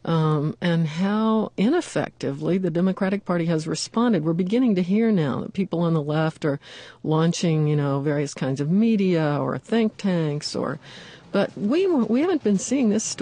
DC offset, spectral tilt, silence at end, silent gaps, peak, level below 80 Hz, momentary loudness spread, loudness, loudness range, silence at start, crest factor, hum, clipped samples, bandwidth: under 0.1%; -6.5 dB/octave; 0 s; none; -10 dBFS; -62 dBFS; 7 LU; -23 LUFS; 1 LU; 0.05 s; 12 dB; none; under 0.1%; 10 kHz